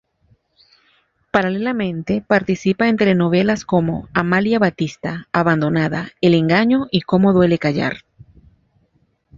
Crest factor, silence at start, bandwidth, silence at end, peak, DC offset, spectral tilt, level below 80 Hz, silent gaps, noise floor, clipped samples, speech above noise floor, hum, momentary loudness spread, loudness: 18 dB; 1.35 s; 7.4 kHz; 1.4 s; 0 dBFS; under 0.1%; -7 dB/octave; -50 dBFS; none; -62 dBFS; under 0.1%; 45 dB; none; 8 LU; -17 LUFS